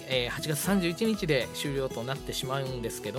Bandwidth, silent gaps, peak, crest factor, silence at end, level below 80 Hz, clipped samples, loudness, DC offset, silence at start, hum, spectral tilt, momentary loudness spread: 16.5 kHz; none; -12 dBFS; 20 dB; 0 s; -50 dBFS; under 0.1%; -30 LUFS; under 0.1%; 0 s; none; -4.5 dB/octave; 7 LU